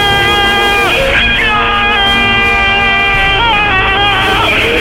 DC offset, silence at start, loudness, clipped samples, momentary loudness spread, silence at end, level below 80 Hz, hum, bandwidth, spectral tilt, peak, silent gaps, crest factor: 0.7%; 0 s; -8 LUFS; under 0.1%; 1 LU; 0 s; -24 dBFS; none; 17 kHz; -3.5 dB/octave; 0 dBFS; none; 10 dB